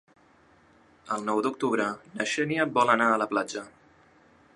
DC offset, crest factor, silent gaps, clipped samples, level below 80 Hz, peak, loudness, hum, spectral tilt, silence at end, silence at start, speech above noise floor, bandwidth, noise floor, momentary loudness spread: under 0.1%; 22 dB; none; under 0.1%; -72 dBFS; -6 dBFS; -26 LUFS; none; -4.5 dB/octave; 0.9 s; 1.05 s; 33 dB; 11.5 kHz; -60 dBFS; 11 LU